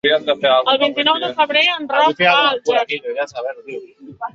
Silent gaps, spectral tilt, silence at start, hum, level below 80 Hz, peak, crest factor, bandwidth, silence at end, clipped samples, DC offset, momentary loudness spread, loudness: none; -3.5 dB/octave; 0.05 s; none; -64 dBFS; 0 dBFS; 16 dB; 7.6 kHz; 0.05 s; under 0.1%; under 0.1%; 15 LU; -15 LUFS